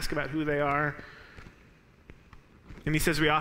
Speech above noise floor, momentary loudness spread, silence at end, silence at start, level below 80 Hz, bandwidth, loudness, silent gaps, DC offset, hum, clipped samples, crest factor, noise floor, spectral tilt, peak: 30 dB; 24 LU; 0 s; 0 s; -44 dBFS; 16 kHz; -29 LUFS; none; under 0.1%; none; under 0.1%; 20 dB; -58 dBFS; -5 dB/octave; -10 dBFS